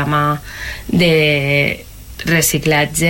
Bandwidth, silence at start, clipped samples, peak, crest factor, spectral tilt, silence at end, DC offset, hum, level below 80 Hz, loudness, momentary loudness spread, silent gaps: 17 kHz; 0 s; under 0.1%; -2 dBFS; 12 dB; -4 dB/octave; 0 s; under 0.1%; none; -36 dBFS; -14 LUFS; 14 LU; none